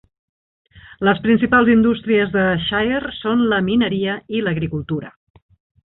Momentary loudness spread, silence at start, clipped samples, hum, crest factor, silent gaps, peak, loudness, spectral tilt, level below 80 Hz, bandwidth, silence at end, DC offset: 9 LU; 0.75 s; under 0.1%; none; 16 dB; none; -2 dBFS; -18 LUFS; -11 dB/octave; -46 dBFS; 4.1 kHz; 0.75 s; under 0.1%